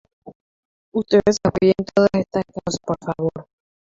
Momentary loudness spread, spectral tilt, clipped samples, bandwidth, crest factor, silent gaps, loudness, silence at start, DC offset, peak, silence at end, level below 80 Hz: 10 LU; -6 dB/octave; under 0.1%; 7.8 kHz; 18 dB; 0.35-0.92 s; -20 LUFS; 0.25 s; under 0.1%; -4 dBFS; 0.55 s; -50 dBFS